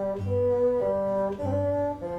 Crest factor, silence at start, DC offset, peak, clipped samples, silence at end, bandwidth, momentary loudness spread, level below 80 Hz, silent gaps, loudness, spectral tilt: 10 dB; 0 s; under 0.1%; -16 dBFS; under 0.1%; 0 s; 8.2 kHz; 4 LU; -52 dBFS; none; -26 LUFS; -9.5 dB/octave